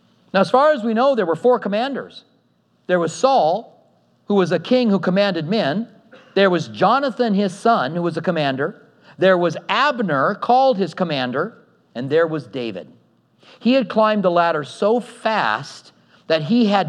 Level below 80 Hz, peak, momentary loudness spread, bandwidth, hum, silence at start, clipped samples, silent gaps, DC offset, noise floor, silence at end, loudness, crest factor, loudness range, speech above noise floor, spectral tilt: -80 dBFS; -2 dBFS; 10 LU; 10.5 kHz; none; 0.35 s; under 0.1%; none; under 0.1%; -61 dBFS; 0 s; -19 LUFS; 18 dB; 2 LU; 43 dB; -6 dB/octave